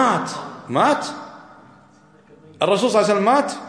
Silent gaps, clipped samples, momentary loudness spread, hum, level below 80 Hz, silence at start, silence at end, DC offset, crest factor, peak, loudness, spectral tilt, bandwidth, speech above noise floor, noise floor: none; under 0.1%; 15 LU; none; -70 dBFS; 0 s; 0 s; under 0.1%; 18 dB; -4 dBFS; -19 LUFS; -4.5 dB/octave; 10.5 kHz; 32 dB; -51 dBFS